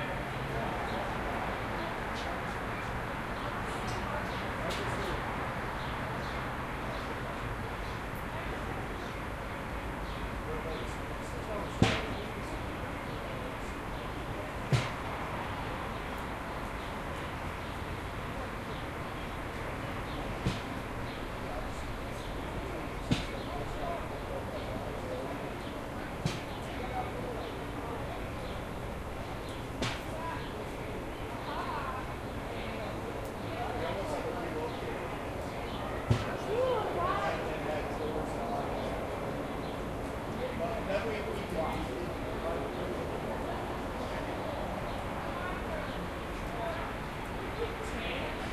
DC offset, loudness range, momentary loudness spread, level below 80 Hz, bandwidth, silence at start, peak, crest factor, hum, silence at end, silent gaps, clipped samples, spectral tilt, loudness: under 0.1%; 4 LU; 5 LU; -46 dBFS; 13 kHz; 0 s; -10 dBFS; 26 dB; none; 0 s; none; under 0.1%; -5.5 dB/octave; -36 LUFS